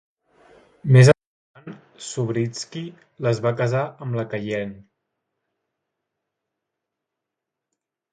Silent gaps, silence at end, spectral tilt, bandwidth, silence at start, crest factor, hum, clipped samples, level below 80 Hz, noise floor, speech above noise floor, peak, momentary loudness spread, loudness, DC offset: 1.27-1.54 s; 3.3 s; -6.5 dB/octave; 11 kHz; 0.85 s; 22 dB; none; under 0.1%; -60 dBFS; -84 dBFS; 64 dB; 0 dBFS; 23 LU; -21 LUFS; under 0.1%